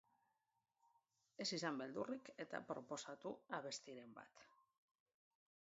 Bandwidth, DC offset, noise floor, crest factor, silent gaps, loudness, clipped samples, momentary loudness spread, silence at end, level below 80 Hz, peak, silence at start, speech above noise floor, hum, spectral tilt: 7.6 kHz; under 0.1%; -89 dBFS; 22 dB; none; -49 LUFS; under 0.1%; 17 LU; 1.25 s; under -90 dBFS; -30 dBFS; 1.4 s; 39 dB; none; -2.5 dB/octave